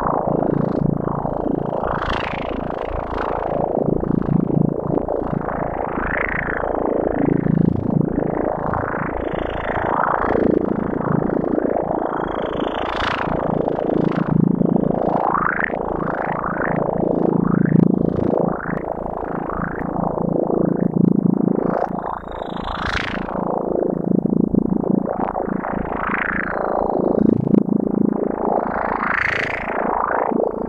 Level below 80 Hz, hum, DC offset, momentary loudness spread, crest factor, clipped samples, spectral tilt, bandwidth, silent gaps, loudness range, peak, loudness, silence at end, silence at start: -38 dBFS; none; under 0.1%; 7 LU; 18 dB; under 0.1%; -9 dB/octave; 7.2 kHz; none; 2 LU; -2 dBFS; -20 LUFS; 0 s; 0 s